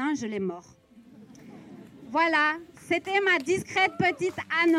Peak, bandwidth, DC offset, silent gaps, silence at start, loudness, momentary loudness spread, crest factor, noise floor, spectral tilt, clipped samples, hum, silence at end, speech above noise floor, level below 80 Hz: -10 dBFS; 13 kHz; under 0.1%; none; 0 s; -26 LUFS; 18 LU; 16 dB; -52 dBFS; -4.5 dB/octave; under 0.1%; none; 0 s; 26 dB; -68 dBFS